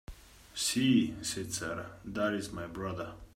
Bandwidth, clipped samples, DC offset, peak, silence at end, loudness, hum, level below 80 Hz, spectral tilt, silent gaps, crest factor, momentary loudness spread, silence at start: 16 kHz; under 0.1%; under 0.1%; -16 dBFS; 0.1 s; -33 LUFS; none; -56 dBFS; -4 dB/octave; none; 18 dB; 14 LU; 0.1 s